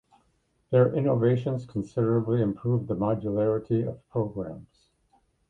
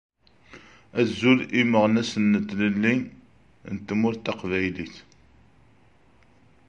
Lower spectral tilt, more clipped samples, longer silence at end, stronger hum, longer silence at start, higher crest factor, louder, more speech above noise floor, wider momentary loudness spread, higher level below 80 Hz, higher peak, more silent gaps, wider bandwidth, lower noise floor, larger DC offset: first, -10.5 dB/octave vs -6 dB/octave; neither; second, 0.85 s vs 1.65 s; neither; first, 0.7 s vs 0.55 s; about the same, 20 dB vs 20 dB; second, -27 LUFS vs -23 LUFS; first, 44 dB vs 36 dB; second, 9 LU vs 16 LU; about the same, -58 dBFS vs -56 dBFS; about the same, -8 dBFS vs -6 dBFS; neither; second, 7.2 kHz vs 8.6 kHz; first, -70 dBFS vs -59 dBFS; neither